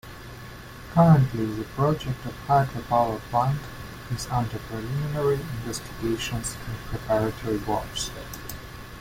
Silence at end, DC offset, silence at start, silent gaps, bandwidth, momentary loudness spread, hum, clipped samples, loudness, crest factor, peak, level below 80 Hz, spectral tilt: 0 s; under 0.1%; 0.05 s; none; 16.5 kHz; 18 LU; none; under 0.1%; -26 LUFS; 20 dB; -6 dBFS; -44 dBFS; -6 dB/octave